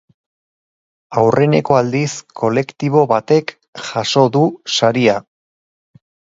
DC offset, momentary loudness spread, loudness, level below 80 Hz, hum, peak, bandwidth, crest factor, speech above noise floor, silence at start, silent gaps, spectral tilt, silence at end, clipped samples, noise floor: under 0.1%; 10 LU; -15 LUFS; -56 dBFS; none; 0 dBFS; 7.8 kHz; 16 dB; over 75 dB; 1.1 s; 3.68-3.73 s; -5.5 dB/octave; 1.1 s; under 0.1%; under -90 dBFS